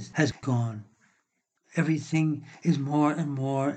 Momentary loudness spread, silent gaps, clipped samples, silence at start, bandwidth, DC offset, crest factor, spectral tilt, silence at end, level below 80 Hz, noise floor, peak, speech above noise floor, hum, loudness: 6 LU; none; under 0.1%; 0 s; 8.8 kHz; under 0.1%; 18 dB; -7 dB/octave; 0 s; -68 dBFS; -76 dBFS; -10 dBFS; 49 dB; none; -28 LUFS